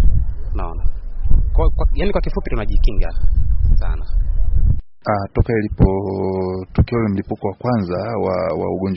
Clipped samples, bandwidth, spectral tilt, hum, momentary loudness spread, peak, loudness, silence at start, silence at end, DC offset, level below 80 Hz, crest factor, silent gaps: under 0.1%; 5.6 kHz; -8 dB/octave; none; 7 LU; 0 dBFS; -21 LUFS; 0 s; 0 s; under 0.1%; -18 dBFS; 14 dB; none